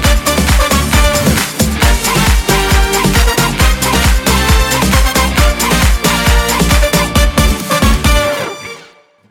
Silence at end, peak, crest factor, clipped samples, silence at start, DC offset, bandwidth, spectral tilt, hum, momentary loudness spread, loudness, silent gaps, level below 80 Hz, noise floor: 0.5 s; 0 dBFS; 10 dB; under 0.1%; 0 s; under 0.1%; over 20 kHz; -4 dB/octave; none; 2 LU; -11 LUFS; none; -14 dBFS; -42 dBFS